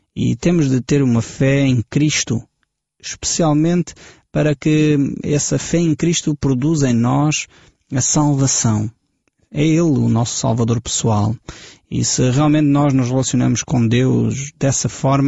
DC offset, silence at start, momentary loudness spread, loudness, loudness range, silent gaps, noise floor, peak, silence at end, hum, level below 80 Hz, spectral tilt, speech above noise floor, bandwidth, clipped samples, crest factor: under 0.1%; 0.15 s; 8 LU; -16 LUFS; 2 LU; none; -70 dBFS; -4 dBFS; 0 s; none; -44 dBFS; -5.5 dB/octave; 54 dB; 8.2 kHz; under 0.1%; 12 dB